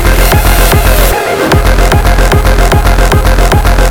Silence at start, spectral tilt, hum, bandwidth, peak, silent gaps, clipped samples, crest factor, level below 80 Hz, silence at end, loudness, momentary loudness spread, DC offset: 0 s; -4.5 dB/octave; none; 19.5 kHz; 0 dBFS; none; 1%; 6 dB; -8 dBFS; 0 s; -8 LUFS; 1 LU; under 0.1%